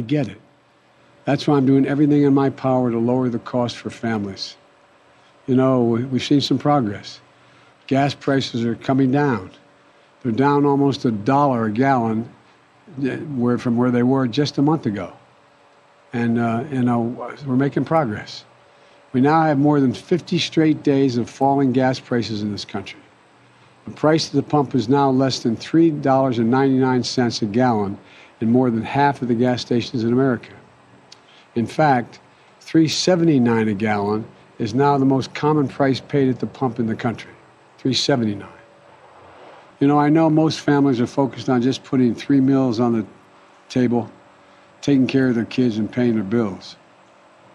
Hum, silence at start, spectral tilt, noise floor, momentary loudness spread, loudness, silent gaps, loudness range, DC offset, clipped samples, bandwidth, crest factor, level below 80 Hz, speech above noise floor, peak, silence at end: none; 0 s; -6.5 dB/octave; -55 dBFS; 11 LU; -19 LUFS; none; 4 LU; under 0.1%; under 0.1%; 10 kHz; 16 dB; -62 dBFS; 37 dB; -4 dBFS; 0.8 s